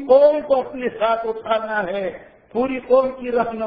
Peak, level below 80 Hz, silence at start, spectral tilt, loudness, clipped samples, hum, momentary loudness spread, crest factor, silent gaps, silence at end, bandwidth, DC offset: -4 dBFS; -54 dBFS; 0 s; -8 dB/octave; -20 LUFS; under 0.1%; none; 12 LU; 16 dB; none; 0 s; 5.2 kHz; under 0.1%